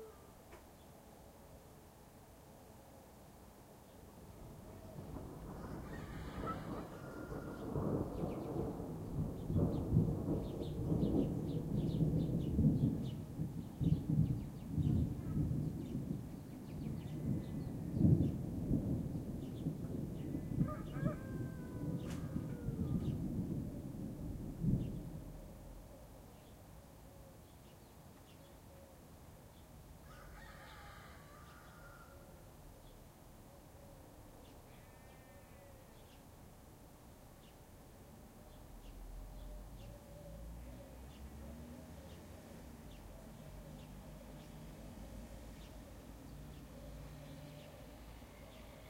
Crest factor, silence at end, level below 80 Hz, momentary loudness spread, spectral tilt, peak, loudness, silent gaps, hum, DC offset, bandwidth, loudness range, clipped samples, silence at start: 24 dB; 0 s; -54 dBFS; 22 LU; -8.5 dB/octave; -18 dBFS; -41 LUFS; none; none; under 0.1%; 16 kHz; 21 LU; under 0.1%; 0 s